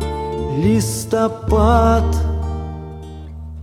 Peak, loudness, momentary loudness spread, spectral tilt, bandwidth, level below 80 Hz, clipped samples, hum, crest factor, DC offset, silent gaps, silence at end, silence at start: 0 dBFS; -17 LUFS; 20 LU; -6.5 dB/octave; 15 kHz; -24 dBFS; under 0.1%; none; 16 dB; under 0.1%; none; 0 s; 0 s